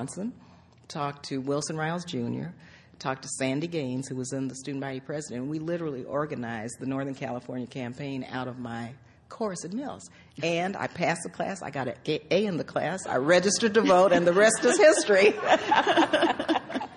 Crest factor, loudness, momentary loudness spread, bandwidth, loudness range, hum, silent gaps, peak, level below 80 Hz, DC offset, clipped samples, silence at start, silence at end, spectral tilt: 20 dB; -27 LUFS; 15 LU; 11.5 kHz; 13 LU; none; none; -8 dBFS; -64 dBFS; under 0.1%; under 0.1%; 0 s; 0 s; -4 dB/octave